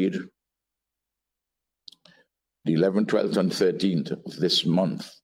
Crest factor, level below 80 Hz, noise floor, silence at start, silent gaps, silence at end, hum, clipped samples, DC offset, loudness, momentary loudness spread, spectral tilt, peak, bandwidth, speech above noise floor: 18 dB; -70 dBFS; -86 dBFS; 0 s; none; 0.15 s; none; under 0.1%; under 0.1%; -24 LUFS; 11 LU; -6 dB/octave; -10 dBFS; 15 kHz; 62 dB